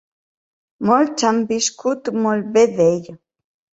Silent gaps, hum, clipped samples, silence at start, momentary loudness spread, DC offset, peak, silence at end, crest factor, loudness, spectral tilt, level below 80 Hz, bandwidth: none; none; under 0.1%; 0.8 s; 7 LU; under 0.1%; -2 dBFS; 0.6 s; 18 dB; -18 LUFS; -4.5 dB/octave; -62 dBFS; 8.2 kHz